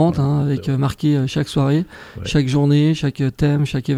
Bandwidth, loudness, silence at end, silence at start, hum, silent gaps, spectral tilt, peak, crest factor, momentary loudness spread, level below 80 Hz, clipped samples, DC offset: 11 kHz; -18 LUFS; 0 s; 0 s; none; none; -7.5 dB/octave; -4 dBFS; 14 dB; 5 LU; -40 dBFS; under 0.1%; under 0.1%